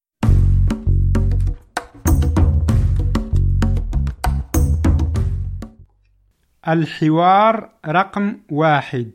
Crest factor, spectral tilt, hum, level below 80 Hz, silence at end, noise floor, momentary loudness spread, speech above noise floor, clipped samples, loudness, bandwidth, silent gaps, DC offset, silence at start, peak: 14 dB; -7 dB/octave; none; -22 dBFS; 0.05 s; -59 dBFS; 9 LU; 43 dB; under 0.1%; -18 LUFS; 16.5 kHz; none; under 0.1%; 0.2 s; -2 dBFS